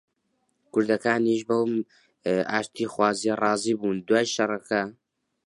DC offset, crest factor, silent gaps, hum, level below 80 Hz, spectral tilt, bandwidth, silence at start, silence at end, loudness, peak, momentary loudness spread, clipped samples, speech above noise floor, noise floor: under 0.1%; 20 dB; none; none; -68 dBFS; -4.5 dB/octave; 11.5 kHz; 0.75 s; 0.55 s; -25 LUFS; -6 dBFS; 7 LU; under 0.1%; 49 dB; -74 dBFS